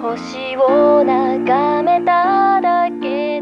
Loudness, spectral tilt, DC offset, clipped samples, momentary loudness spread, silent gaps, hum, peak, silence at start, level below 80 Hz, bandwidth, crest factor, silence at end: -15 LUFS; -6 dB/octave; under 0.1%; under 0.1%; 9 LU; none; none; -2 dBFS; 0 s; -56 dBFS; 7.2 kHz; 12 dB; 0 s